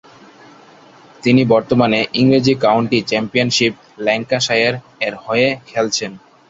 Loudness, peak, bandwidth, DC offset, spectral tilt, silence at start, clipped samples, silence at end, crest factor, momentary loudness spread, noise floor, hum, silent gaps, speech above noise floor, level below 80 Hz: -16 LUFS; 0 dBFS; 7.8 kHz; under 0.1%; -4.5 dB/octave; 1.25 s; under 0.1%; 0.35 s; 16 dB; 8 LU; -44 dBFS; none; none; 28 dB; -54 dBFS